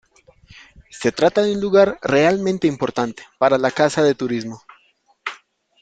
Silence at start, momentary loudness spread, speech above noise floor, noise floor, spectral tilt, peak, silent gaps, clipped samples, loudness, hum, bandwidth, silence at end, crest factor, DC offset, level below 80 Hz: 0.95 s; 16 LU; 42 dB; -60 dBFS; -5.5 dB/octave; -2 dBFS; none; under 0.1%; -18 LUFS; none; 9.2 kHz; 0.45 s; 18 dB; under 0.1%; -56 dBFS